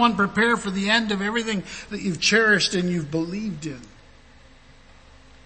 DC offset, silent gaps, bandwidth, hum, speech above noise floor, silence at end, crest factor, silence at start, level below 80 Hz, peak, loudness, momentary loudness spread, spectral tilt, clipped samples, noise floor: under 0.1%; none; 8.8 kHz; none; 27 dB; 1.55 s; 20 dB; 0 s; -50 dBFS; -4 dBFS; -22 LUFS; 14 LU; -4 dB/octave; under 0.1%; -50 dBFS